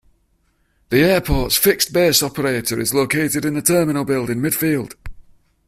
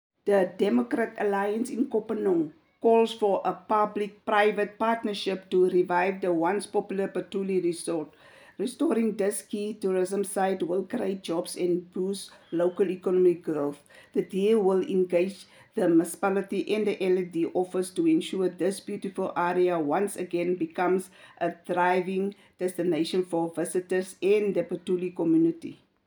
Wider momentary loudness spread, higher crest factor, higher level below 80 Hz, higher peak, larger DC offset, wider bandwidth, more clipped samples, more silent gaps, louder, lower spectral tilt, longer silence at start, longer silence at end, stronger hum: second, 6 LU vs 9 LU; about the same, 18 dB vs 18 dB; first, -36 dBFS vs -78 dBFS; first, 0 dBFS vs -8 dBFS; neither; second, 16 kHz vs over 20 kHz; neither; neither; first, -17 LUFS vs -27 LUFS; second, -4 dB/octave vs -5.5 dB/octave; first, 0.9 s vs 0.25 s; first, 0.45 s vs 0.3 s; neither